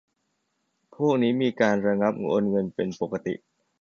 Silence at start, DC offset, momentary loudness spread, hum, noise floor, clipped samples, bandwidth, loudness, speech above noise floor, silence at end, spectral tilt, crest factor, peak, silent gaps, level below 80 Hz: 1 s; under 0.1%; 8 LU; none; -75 dBFS; under 0.1%; 7 kHz; -25 LUFS; 51 dB; 0.45 s; -7 dB/octave; 20 dB; -6 dBFS; none; -64 dBFS